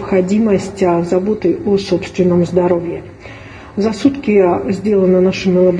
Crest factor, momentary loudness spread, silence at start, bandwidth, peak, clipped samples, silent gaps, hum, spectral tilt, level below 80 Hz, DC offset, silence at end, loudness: 14 dB; 14 LU; 0 s; 9.8 kHz; 0 dBFS; under 0.1%; none; none; -7.5 dB/octave; -42 dBFS; under 0.1%; 0 s; -14 LUFS